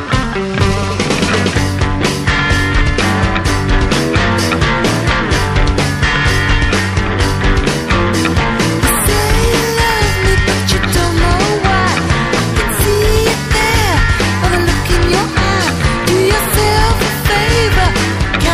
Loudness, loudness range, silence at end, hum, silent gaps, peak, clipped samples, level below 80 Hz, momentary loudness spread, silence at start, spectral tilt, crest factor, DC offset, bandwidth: -13 LUFS; 1 LU; 0 s; none; none; 0 dBFS; under 0.1%; -18 dBFS; 3 LU; 0 s; -4.5 dB/octave; 12 dB; under 0.1%; 15.5 kHz